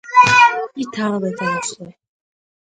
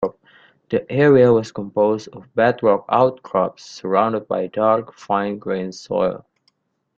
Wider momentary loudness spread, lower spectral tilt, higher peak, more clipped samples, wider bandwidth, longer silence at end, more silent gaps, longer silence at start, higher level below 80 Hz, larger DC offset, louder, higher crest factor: first, 15 LU vs 12 LU; second, -3.5 dB/octave vs -7 dB/octave; about the same, 0 dBFS vs -2 dBFS; neither; first, 9.4 kHz vs 7.6 kHz; about the same, 0.85 s vs 0.8 s; neither; about the same, 0.05 s vs 0 s; about the same, -58 dBFS vs -58 dBFS; neither; first, -15 LUFS vs -19 LUFS; about the same, 18 dB vs 18 dB